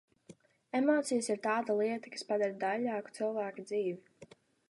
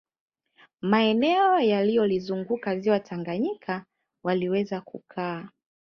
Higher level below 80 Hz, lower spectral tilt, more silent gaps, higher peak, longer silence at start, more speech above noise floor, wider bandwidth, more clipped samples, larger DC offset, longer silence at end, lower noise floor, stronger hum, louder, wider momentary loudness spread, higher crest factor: second, -88 dBFS vs -70 dBFS; second, -4.5 dB/octave vs -7.5 dB/octave; neither; second, -18 dBFS vs -8 dBFS; second, 0.3 s vs 0.85 s; second, 26 dB vs 36 dB; first, 11.5 kHz vs 6.4 kHz; neither; neither; about the same, 0.45 s vs 0.5 s; about the same, -60 dBFS vs -61 dBFS; neither; second, -34 LUFS vs -25 LUFS; second, 8 LU vs 13 LU; about the same, 18 dB vs 18 dB